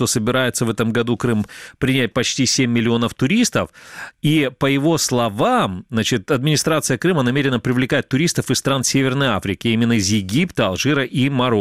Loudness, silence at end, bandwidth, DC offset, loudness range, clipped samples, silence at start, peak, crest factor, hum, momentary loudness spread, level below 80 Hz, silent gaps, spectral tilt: -18 LUFS; 0 s; 16 kHz; 0.2%; 1 LU; under 0.1%; 0 s; -4 dBFS; 14 dB; none; 4 LU; -48 dBFS; none; -4.5 dB/octave